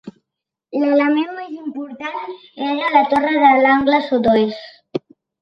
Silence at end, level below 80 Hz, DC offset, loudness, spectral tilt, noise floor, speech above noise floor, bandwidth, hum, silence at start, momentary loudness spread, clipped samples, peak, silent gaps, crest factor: 0.45 s; -56 dBFS; under 0.1%; -16 LUFS; -6.5 dB/octave; -82 dBFS; 66 dB; 6.4 kHz; none; 0.05 s; 16 LU; under 0.1%; -2 dBFS; none; 16 dB